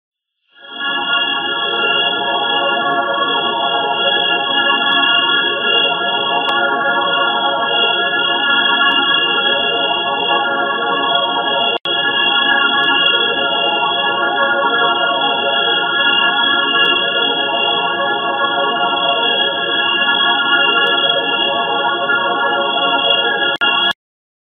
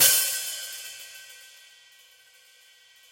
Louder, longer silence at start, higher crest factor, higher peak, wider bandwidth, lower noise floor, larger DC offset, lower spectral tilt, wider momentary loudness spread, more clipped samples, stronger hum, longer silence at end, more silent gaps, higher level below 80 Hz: first, -13 LUFS vs -25 LUFS; first, 0.6 s vs 0 s; second, 16 dB vs 24 dB; first, 0 dBFS vs -4 dBFS; second, 6.6 kHz vs 17 kHz; second, -51 dBFS vs -56 dBFS; neither; first, -4.5 dB/octave vs 2.5 dB/octave; second, 4 LU vs 27 LU; neither; neither; second, 0.55 s vs 1.65 s; neither; first, -64 dBFS vs -74 dBFS